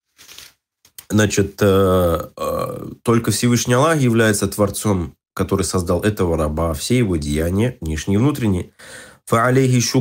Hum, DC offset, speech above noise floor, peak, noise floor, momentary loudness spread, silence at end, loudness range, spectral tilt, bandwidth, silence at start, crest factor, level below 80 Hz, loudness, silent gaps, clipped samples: none; under 0.1%; 40 dB; -4 dBFS; -57 dBFS; 10 LU; 0 s; 3 LU; -5.5 dB/octave; 16.5 kHz; 0.3 s; 14 dB; -36 dBFS; -18 LUFS; none; under 0.1%